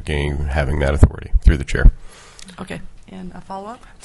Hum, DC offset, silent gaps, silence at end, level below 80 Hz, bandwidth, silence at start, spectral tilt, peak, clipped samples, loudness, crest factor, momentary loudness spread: none; under 0.1%; none; 0.3 s; -20 dBFS; 11.5 kHz; 0 s; -7 dB/octave; 0 dBFS; under 0.1%; -18 LUFS; 16 dB; 21 LU